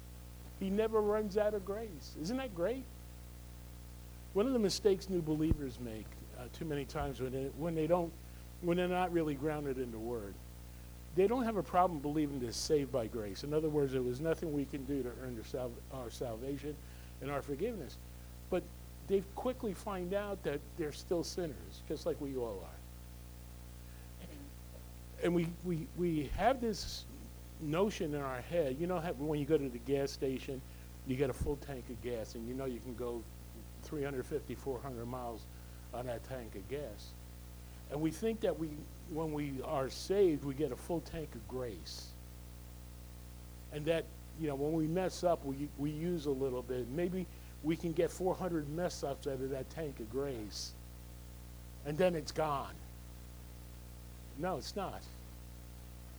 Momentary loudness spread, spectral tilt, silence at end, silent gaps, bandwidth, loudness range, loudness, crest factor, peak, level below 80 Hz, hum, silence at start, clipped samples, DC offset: 19 LU; -6 dB/octave; 0 s; none; over 20 kHz; 7 LU; -38 LUFS; 20 dB; -18 dBFS; -52 dBFS; 60 Hz at -50 dBFS; 0 s; under 0.1%; under 0.1%